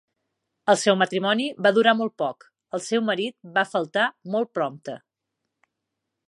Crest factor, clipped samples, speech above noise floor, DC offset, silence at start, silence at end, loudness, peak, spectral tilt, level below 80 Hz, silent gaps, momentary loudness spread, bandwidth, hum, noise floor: 22 dB; under 0.1%; 59 dB; under 0.1%; 0.65 s; 1.35 s; -23 LUFS; -4 dBFS; -4 dB/octave; -80 dBFS; none; 12 LU; 11.5 kHz; none; -82 dBFS